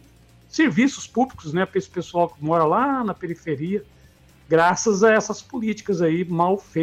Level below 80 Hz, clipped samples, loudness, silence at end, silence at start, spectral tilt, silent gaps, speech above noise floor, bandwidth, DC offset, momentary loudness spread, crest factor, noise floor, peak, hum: -56 dBFS; under 0.1%; -22 LUFS; 0 s; 0.55 s; -5.5 dB/octave; none; 31 dB; 13.5 kHz; under 0.1%; 10 LU; 16 dB; -52 dBFS; -6 dBFS; none